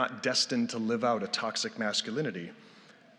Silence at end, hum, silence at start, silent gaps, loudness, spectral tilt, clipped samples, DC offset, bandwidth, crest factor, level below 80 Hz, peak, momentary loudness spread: 0.25 s; none; 0 s; none; -30 LUFS; -3 dB/octave; under 0.1%; under 0.1%; 11.5 kHz; 20 dB; -88 dBFS; -12 dBFS; 8 LU